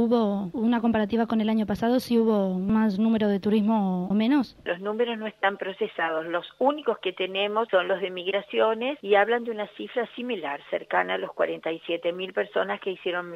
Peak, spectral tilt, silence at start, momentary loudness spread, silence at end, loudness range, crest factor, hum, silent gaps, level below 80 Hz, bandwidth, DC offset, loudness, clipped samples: -8 dBFS; -7 dB/octave; 0 s; 8 LU; 0 s; 5 LU; 18 dB; none; none; -60 dBFS; 13 kHz; under 0.1%; -26 LUFS; under 0.1%